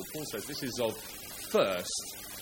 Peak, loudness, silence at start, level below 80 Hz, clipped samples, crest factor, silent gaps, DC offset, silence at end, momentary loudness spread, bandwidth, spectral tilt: -14 dBFS; -34 LUFS; 0 s; -62 dBFS; under 0.1%; 20 dB; none; under 0.1%; 0 s; 12 LU; 17 kHz; -3 dB/octave